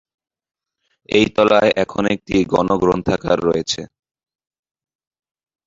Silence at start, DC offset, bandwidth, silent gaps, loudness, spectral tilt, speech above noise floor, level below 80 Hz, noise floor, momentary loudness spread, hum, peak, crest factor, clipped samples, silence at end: 1.1 s; under 0.1%; 7.8 kHz; none; -17 LUFS; -5 dB/octave; 54 dB; -46 dBFS; -70 dBFS; 7 LU; none; -2 dBFS; 18 dB; under 0.1%; 1.8 s